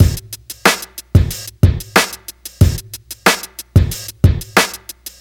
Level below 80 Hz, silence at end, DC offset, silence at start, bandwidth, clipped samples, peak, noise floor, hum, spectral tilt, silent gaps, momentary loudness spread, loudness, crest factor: -26 dBFS; 0.1 s; under 0.1%; 0 s; 18.5 kHz; under 0.1%; 0 dBFS; -34 dBFS; none; -4.5 dB/octave; none; 15 LU; -16 LUFS; 16 dB